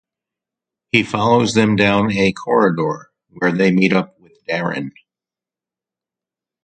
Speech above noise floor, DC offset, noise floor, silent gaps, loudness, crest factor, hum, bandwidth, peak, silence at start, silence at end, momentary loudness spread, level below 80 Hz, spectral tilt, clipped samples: 73 dB; under 0.1%; -89 dBFS; none; -16 LUFS; 18 dB; none; 9.4 kHz; 0 dBFS; 0.95 s; 1.75 s; 13 LU; -52 dBFS; -6 dB/octave; under 0.1%